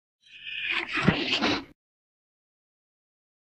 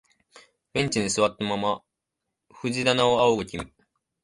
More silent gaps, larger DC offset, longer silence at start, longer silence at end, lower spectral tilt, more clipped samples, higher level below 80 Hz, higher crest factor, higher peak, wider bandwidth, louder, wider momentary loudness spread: neither; neither; second, 0.3 s vs 0.75 s; first, 1.85 s vs 0.55 s; about the same, -5 dB/octave vs -4 dB/octave; neither; about the same, -56 dBFS vs -56 dBFS; about the same, 24 dB vs 20 dB; about the same, -6 dBFS vs -6 dBFS; second, 9.6 kHz vs 11.5 kHz; second, -27 LUFS vs -24 LUFS; second, 10 LU vs 14 LU